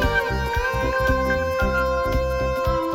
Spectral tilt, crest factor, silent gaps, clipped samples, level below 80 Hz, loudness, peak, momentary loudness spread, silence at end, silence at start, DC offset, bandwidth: -6 dB/octave; 14 dB; none; under 0.1%; -28 dBFS; -22 LUFS; -8 dBFS; 2 LU; 0 s; 0 s; under 0.1%; 16.5 kHz